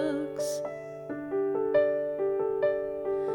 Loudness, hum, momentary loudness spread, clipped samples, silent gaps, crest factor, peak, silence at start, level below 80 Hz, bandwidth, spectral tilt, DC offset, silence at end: -30 LUFS; none; 12 LU; under 0.1%; none; 16 dB; -12 dBFS; 0 s; -66 dBFS; 18.5 kHz; -5 dB/octave; under 0.1%; 0 s